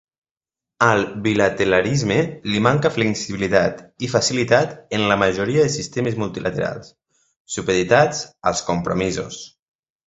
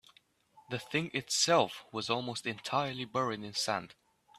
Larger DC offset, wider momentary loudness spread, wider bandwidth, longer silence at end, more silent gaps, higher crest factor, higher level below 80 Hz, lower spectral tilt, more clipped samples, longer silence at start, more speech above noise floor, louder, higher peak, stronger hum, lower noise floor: neither; second, 8 LU vs 11 LU; second, 8.2 kHz vs 15 kHz; about the same, 0.6 s vs 0.5 s; first, 7.40-7.45 s vs none; about the same, 20 dB vs 22 dB; first, -48 dBFS vs -74 dBFS; first, -4.5 dB/octave vs -3 dB/octave; neither; first, 0.8 s vs 0.55 s; first, 71 dB vs 32 dB; first, -19 LUFS vs -33 LUFS; first, 0 dBFS vs -12 dBFS; neither; first, -90 dBFS vs -66 dBFS